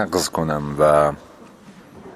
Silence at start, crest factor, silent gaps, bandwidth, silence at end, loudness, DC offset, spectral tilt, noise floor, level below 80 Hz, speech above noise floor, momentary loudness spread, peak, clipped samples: 0 s; 18 dB; none; 15.5 kHz; 0 s; -19 LUFS; under 0.1%; -5 dB/octave; -44 dBFS; -44 dBFS; 25 dB; 8 LU; -2 dBFS; under 0.1%